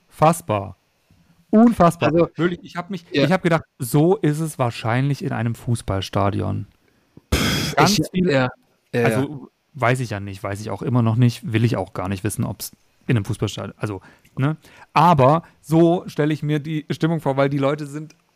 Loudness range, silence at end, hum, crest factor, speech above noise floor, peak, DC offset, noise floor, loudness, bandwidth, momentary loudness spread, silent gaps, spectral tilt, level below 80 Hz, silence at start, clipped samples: 4 LU; 0.25 s; none; 16 dB; 39 dB; -4 dBFS; under 0.1%; -59 dBFS; -20 LUFS; 15.5 kHz; 13 LU; none; -6 dB/octave; -44 dBFS; 0.2 s; under 0.1%